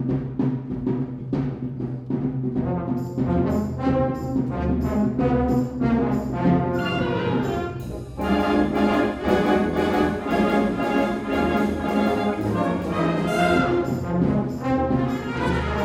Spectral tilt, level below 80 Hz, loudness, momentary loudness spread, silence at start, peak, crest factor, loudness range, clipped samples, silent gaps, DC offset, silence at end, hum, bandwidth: -7.5 dB/octave; -38 dBFS; -23 LUFS; 6 LU; 0 s; -6 dBFS; 16 dB; 3 LU; under 0.1%; none; under 0.1%; 0 s; none; 16 kHz